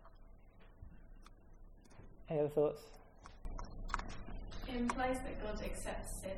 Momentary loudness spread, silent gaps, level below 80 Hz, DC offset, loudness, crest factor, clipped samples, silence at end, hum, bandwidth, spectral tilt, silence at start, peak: 24 LU; none; -50 dBFS; under 0.1%; -41 LUFS; 24 dB; under 0.1%; 0 s; none; 15.5 kHz; -5.5 dB/octave; 0 s; -20 dBFS